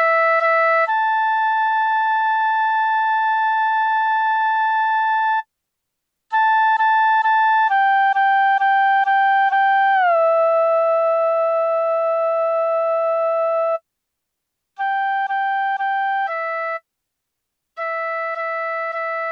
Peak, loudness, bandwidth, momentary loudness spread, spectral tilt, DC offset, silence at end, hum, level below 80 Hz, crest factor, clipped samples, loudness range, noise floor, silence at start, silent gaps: -8 dBFS; -18 LUFS; 6.6 kHz; 8 LU; 0.5 dB/octave; under 0.1%; 0 s; none; -82 dBFS; 10 dB; under 0.1%; 7 LU; -79 dBFS; 0 s; none